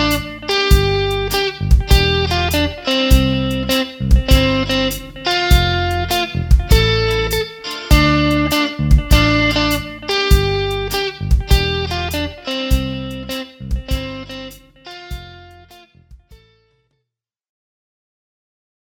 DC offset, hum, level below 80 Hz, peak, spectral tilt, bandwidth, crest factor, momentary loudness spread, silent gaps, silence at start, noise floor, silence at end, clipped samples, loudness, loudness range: under 0.1%; none; -20 dBFS; 0 dBFS; -5 dB/octave; 19.5 kHz; 16 dB; 13 LU; none; 0 s; -79 dBFS; 2.7 s; under 0.1%; -16 LUFS; 13 LU